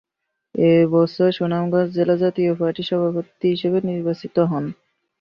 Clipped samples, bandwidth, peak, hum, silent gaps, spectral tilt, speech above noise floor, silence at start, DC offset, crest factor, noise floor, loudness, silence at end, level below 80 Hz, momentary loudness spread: under 0.1%; 6 kHz; -4 dBFS; none; none; -9.5 dB/octave; 60 dB; 0.55 s; under 0.1%; 14 dB; -79 dBFS; -20 LUFS; 0.5 s; -62 dBFS; 8 LU